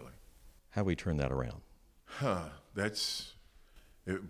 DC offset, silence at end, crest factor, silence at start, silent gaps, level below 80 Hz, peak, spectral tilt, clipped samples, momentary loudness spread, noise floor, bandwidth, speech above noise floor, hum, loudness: under 0.1%; 0 s; 22 dB; 0 s; none; -50 dBFS; -18 dBFS; -5 dB/octave; under 0.1%; 15 LU; -60 dBFS; 16 kHz; 24 dB; none; -36 LUFS